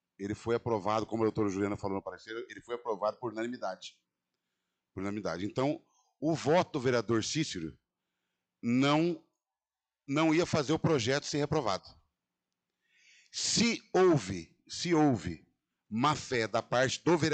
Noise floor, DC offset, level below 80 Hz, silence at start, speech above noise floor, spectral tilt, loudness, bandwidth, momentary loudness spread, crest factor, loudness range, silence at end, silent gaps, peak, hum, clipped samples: under -90 dBFS; under 0.1%; -66 dBFS; 0.2 s; over 59 dB; -5 dB/octave; -31 LUFS; 9.2 kHz; 14 LU; 16 dB; 7 LU; 0 s; none; -16 dBFS; none; under 0.1%